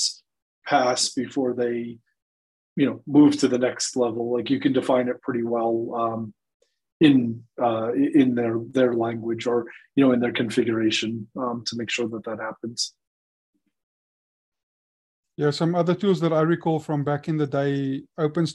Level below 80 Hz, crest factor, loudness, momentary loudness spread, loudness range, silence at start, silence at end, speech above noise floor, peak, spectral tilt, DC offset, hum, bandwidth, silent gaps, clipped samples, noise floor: -68 dBFS; 20 dB; -23 LUFS; 10 LU; 9 LU; 0 s; 0 s; over 67 dB; -4 dBFS; -5 dB/octave; under 0.1%; none; 11.5 kHz; 0.42-0.62 s, 2.22-2.76 s, 6.54-6.60 s, 6.92-7.00 s, 13.07-13.53 s, 13.83-14.52 s, 14.63-15.23 s; under 0.1%; under -90 dBFS